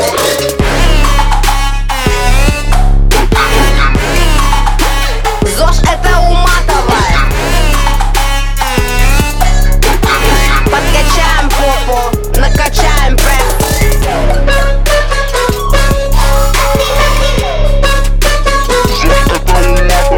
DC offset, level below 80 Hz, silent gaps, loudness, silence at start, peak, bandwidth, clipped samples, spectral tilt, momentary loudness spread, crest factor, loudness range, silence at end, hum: under 0.1%; -10 dBFS; none; -11 LUFS; 0 s; 0 dBFS; 19 kHz; under 0.1%; -4 dB/octave; 3 LU; 8 dB; 1 LU; 0 s; none